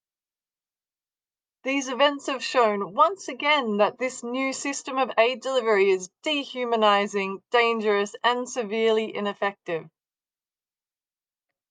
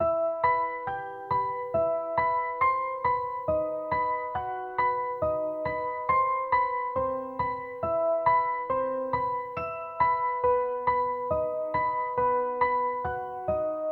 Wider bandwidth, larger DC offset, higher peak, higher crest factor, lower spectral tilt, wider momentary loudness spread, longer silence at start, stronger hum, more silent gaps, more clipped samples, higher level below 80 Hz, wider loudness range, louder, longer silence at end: first, 10 kHz vs 4.5 kHz; neither; first, -6 dBFS vs -12 dBFS; about the same, 20 dB vs 16 dB; second, -3 dB/octave vs -8.5 dB/octave; about the same, 8 LU vs 6 LU; first, 1.65 s vs 0 s; neither; neither; neither; second, -84 dBFS vs -54 dBFS; first, 4 LU vs 1 LU; first, -24 LUFS vs -28 LUFS; first, 1.85 s vs 0 s